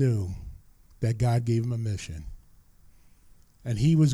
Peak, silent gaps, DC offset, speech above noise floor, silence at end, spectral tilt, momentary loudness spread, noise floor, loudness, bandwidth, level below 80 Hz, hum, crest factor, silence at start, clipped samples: -12 dBFS; none; under 0.1%; 31 dB; 0 s; -7.5 dB/octave; 18 LU; -55 dBFS; -28 LUFS; 12 kHz; -46 dBFS; none; 14 dB; 0 s; under 0.1%